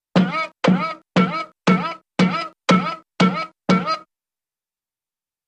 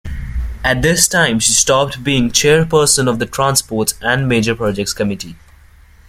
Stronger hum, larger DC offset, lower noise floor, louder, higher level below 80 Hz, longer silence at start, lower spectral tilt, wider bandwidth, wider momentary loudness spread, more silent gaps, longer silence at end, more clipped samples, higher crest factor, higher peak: neither; neither; first, under -90 dBFS vs -44 dBFS; second, -20 LUFS vs -13 LUFS; second, -60 dBFS vs -32 dBFS; about the same, 0.15 s vs 0.05 s; first, -6.5 dB/octave vs -3 dB/octave; second, 9 kHz vs 16.5 kHz; about the same, 7 LU vs 9 LU; neither; first, 1.45 s vs 0.75 s; neither; about the same, 20 dB vs 16 dB; about the same, 0 dBFS vs 0 dBFS